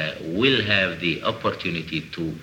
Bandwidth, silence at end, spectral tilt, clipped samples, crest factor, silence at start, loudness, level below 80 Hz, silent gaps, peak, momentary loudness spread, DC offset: 18 kHz; 0 s; -5.5 dB/octave; under 0.1%; 18 dB; 0 s; -23 LUFS; -52 dBFS; none; -6 dBFS; 9 LU; under 0.1%